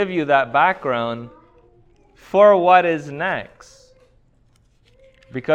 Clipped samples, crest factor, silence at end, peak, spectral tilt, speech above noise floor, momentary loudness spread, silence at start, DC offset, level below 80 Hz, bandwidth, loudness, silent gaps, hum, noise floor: under 0.1%; 18 dB; 0 s; -2 dBFS; -6.5 dB/octave; 40 dB; 18 LU; 0 s; under 0.1%; -58 dBFS; 8 kHz; -17 LUFS; none; none; -57 dBFS